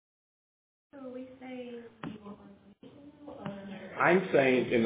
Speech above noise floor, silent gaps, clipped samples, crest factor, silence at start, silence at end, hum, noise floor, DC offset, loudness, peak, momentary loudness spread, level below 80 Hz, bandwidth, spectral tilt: 26 dB; none; under 0.1%; 22 dB; 0.95 s; 0 s; none; -55 dBFS; under 0.1%; -27 LUFS; -10 dBFS; 24 LU; -74 dBFS; 4 kHz; -4.5 dB/octave